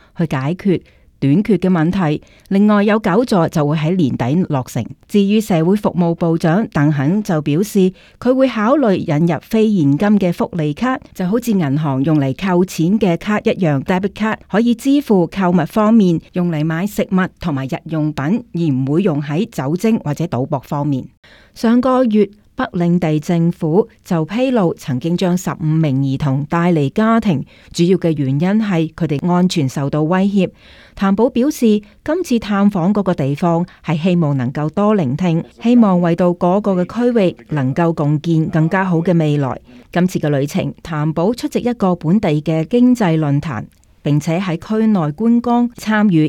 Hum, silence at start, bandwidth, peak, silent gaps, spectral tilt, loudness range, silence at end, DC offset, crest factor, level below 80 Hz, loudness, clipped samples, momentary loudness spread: none; 0.15 s; 15 kHz; -2 dBFS; 21.17-21.23 s; -7.5 dB/octave; 2 LU; 0 s; under 0.1%; 14 dB; -48 dBFS; -16 LUFS; under 0.1%; 6 LU